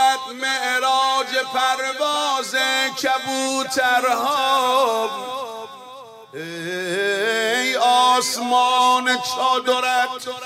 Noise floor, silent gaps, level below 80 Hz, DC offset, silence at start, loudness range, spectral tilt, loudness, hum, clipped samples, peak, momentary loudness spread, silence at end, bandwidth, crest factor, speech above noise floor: -40 dBFS; none; -72 dBFS; under 0.1%; 0 s; 4 LU; -1 dB/octave; -19 LUFS; none; under 0.1%; -6 dBFS; 13 LU; 0 s; 16 kHz; 14 dB; 20 dB